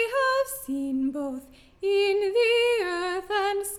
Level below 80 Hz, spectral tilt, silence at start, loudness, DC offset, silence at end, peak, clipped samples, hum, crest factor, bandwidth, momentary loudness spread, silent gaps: -60 dBFS; -2 dB/octave; 0 s; -25 LUFS; under 0.1%; 0 s; -14 dBFS; under 0.1%; none; 12 dB; 17 kHz; 10 LU; none